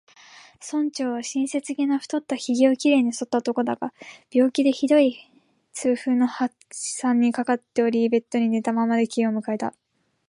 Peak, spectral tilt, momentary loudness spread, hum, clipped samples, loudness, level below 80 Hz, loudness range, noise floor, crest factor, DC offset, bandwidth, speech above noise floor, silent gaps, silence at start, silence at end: -6 dBFS; -4.5 dB/octave; 10 LU; none; under 0.1%; -23 LUFS; -76 dBFS; 2 LU; -49 dBFS; 18 dB; under 0.1%; 11.5 kHz; 27 dB; none; 0.35 s; 0.6 s